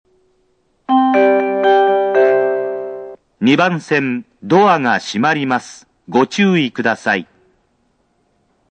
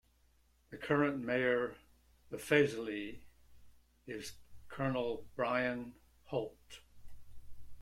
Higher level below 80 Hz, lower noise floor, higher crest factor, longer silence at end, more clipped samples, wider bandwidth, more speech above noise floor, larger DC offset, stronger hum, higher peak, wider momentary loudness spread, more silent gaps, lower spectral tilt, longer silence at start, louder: about the same, -66 dBFS vs -64 dBFS; second, -61 dBFS vs -70 dBFS; second, 16 dB vs 22 dB; first, 1.5 s vs 0 s; neither; second, 9 kHz vs 16 kHz; first, 46 dB vs 35 dB; neither; neither; first, 0 dBFS vs -16 dBFS; second, 12 LU vs 21 LU; neither; about the same, -5.5 dB/octave vs -5.5 dB/octave; first, 0.9 s vs 0.7 s; first, -15 LUFS vs -36 LUFS